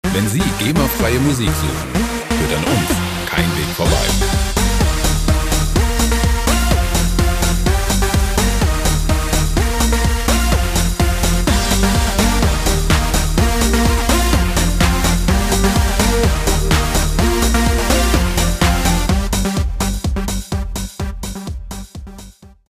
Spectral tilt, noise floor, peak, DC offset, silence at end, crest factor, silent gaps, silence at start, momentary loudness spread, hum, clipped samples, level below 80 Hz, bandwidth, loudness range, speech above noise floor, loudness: -4.5 dB/octave; -39 dBFS; 0 dBFS; under 0.1%; 0.25 s; 14 dB; none; 0.05 s; 5 LU; none; under 0.1%; -18 dBFS; 16 kHz; 2 LU; 23 dB; -16 LUFS